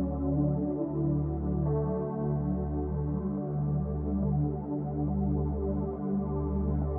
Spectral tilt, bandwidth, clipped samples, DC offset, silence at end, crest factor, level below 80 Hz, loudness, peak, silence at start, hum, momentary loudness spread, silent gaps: -14.5 dB/octave; 2.1 kHz; under 0.1%; under 0.1%; 0 s; 14 dB; -38 dBFS; -31 LUFS; -16 dBFS; 0 s; none; 3 LU; none